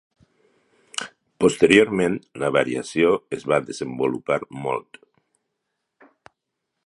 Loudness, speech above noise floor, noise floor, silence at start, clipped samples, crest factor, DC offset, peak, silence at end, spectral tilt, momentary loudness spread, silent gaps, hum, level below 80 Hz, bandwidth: -22 LUFS; 59 dB; -80 dBFS; 0.95 s; under 0.1%; 24 dB; under 0.1%; 0 dBFS; 2.05 s; -5 dB/octave; 16 LU; none; none; -58 dBFS; 11.5 kHz